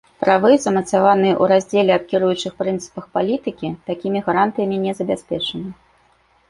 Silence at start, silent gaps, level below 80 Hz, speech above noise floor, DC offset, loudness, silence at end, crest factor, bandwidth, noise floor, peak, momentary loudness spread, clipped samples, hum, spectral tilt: 0.2 s; none; -56 dBFS; 40 dB; under 0.1%; -18 LUFS; 0.75 s; 18 dB; 11.5 kHz; -57 dBFS; -2 dBFS; 11 LU; under 0.1%; none; -5.5 dB/octave